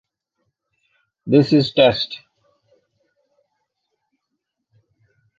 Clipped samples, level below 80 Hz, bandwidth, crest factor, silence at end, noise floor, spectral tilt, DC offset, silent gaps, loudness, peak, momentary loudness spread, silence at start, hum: under 0.1%; -58 dBFS; 7.4 kHz; 22 dB; 3.2 s; -78 dBFS; -7.5 dB/octave; under 0.1%; none; -16 LUFS; -2 dBFS; 20 LU; 1.25 s; none